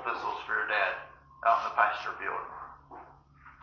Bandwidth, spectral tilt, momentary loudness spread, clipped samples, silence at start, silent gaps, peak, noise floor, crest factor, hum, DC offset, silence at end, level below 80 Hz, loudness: 6.8 kHz; -3.5 dB/octave; 23 LU; under 0.1%; 0 s; none; -10 dBFS; -56 dBFS; 22 dB; none; under 0.1%; 0.1 s; -66 dBFS; -30 LUFS